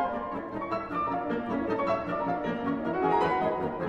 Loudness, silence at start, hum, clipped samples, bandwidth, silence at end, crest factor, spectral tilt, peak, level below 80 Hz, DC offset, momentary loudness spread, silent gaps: -30 LUFS; 0 s; none; under 0.1%; 8.6 kHz; 0 s; 16 dB; -8 dB/octave; -14 dBFS; -56 dBFS; under 0.1%; 7 LU; none